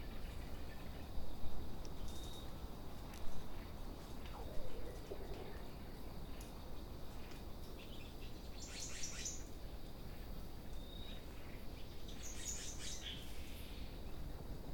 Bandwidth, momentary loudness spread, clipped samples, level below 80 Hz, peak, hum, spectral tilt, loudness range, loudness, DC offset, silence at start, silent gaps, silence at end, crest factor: 18 kHz; 7 LU; under 0.1%; -50 dBFS; -26 dBFS; none; -3.5 dB/octave; 3 LU; -51 LUFS; under 0.1%; 0 s; none; 0 s; 18 dB